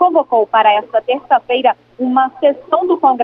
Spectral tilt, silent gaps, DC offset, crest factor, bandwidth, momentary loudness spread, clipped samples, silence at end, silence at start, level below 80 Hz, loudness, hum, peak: -6.5 dB/octave; none; under 0.1%; 12 dB; 4.7 kHz; 5 LU; under 0.1%; 0 s; 0 s; -62 dBFS; -14 LUFS; none; 0 dBFS